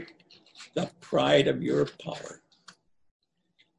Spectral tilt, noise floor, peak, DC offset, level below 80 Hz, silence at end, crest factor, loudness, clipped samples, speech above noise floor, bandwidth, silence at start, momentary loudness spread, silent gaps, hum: -5.5 dB/octave; -69 dBFS; -8 dBFS; under 0.1%; -64 dBFS; 1.45 s; 22 dB; -27 LUFS; under 0.1%; 44 dB; 11 kHz; 0 s; 23 LU; none; none